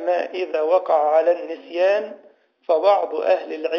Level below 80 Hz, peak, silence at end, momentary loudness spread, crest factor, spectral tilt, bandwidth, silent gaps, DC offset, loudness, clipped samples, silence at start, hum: -88 dBFS; -6 dBFS; 0 s; 8 LU; 14 dB; -4 dB/octave; 6.6 kHz; none; under 0.1%; -20 LUFS; under 0.1%; 0 s; none